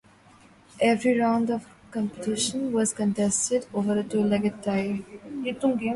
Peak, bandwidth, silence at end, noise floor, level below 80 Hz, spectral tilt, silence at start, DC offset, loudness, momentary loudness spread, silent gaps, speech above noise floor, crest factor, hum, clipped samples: -10 dBFS; 11.5 kHz; 0 s; -54 dBFS; -62 dBFS; -4.5 dB/octave; 0.75 s; under 0.1%; -26 LUFS; 10 LU; none; 29 dB; 16 dB; none; under 0.1%